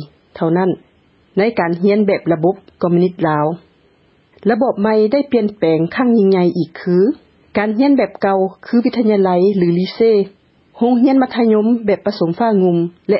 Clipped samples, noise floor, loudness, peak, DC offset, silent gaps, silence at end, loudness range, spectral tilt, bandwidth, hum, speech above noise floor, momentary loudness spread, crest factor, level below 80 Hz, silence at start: under 0.1%; -54 dBFS; -15 LUFS; -2 dBFS; under 0.1%; none; 0 s; 2 LU; -11.5 dB/octave; 5.8 kHz; none; 40 dB; 7 LU; 12 dB; -58 dBFS; 0 s